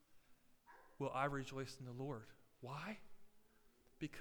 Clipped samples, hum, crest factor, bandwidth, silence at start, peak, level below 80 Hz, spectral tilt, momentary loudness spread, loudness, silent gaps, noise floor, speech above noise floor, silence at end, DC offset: under 0.1%; none; 24 dB; over 20 kHz; 0.1 s; -26 dBFS; -72 dBFS; -6 dB/octave; 24 LU; -47 LUFS; none; -71 dBFS; 25 dB; 0 s; under 0.1%